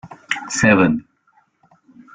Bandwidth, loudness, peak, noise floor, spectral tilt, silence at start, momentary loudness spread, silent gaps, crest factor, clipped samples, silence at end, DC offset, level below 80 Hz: 9.6 kHz; -17 LUFS; -2 dBFS; -60 dBFS; -5 dB/octave; 0.05 s; 12 LU; none; 20 dB; under 0.1%; 1.15 s; under 0.1%; -52 dBFS